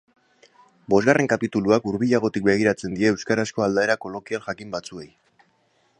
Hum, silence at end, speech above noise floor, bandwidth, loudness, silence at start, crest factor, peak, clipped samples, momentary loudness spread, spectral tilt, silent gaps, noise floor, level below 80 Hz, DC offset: none; 0.95 s; 43 dB; 10.5 kHz; -22 LUFS; 0.9 s; 20 dB; -2 dBFS; under 0.1%; 12 LU; -5.5 dB/octave; none; -64 dBFS; -58 dBFS; under 0.1%